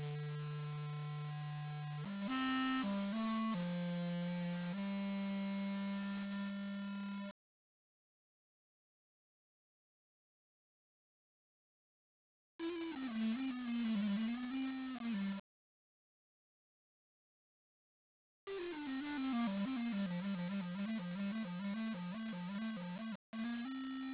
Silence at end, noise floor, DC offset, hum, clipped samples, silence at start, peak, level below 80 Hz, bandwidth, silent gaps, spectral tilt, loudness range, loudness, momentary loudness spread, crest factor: 0 s; under -90 dBFS; under 0.1%; none; under 0.1%; 0 s; -28 dBFS; -78 dBFS; 4 kHz; 7.31-12.59 s, 15.40-18.47 s, 23.15-23.33 s; -5.5 dB/octave; 11 LU; -42 LUFS; 6 LU; 14 dB